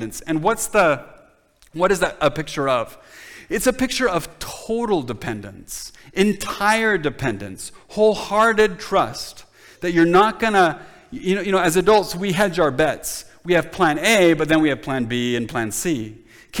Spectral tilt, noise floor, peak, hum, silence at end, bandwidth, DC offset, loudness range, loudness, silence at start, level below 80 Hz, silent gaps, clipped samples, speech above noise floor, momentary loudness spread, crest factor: -4.5 dB/octave; -54 dBFS; -4 dBFS; none; 0 s; 19.5 kHz; under 0.1%; 5 LU; -19 LUFS; 0 s; -46 dBFS; none; under 0.1%; 35 dB; 16 LU; 16 dB